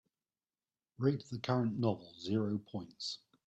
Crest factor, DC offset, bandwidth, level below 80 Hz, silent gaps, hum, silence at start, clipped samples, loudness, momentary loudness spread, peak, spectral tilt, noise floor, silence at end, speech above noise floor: 20 dB; under 0.1%; 8.6 kHz; -76 dBFS; none; none; 1 s; under 0.1%; -37 LUFS; 8 LU; -18 dBFS; -7 dB/octave; under -90 dBFS; 0.3 s; over 54 dB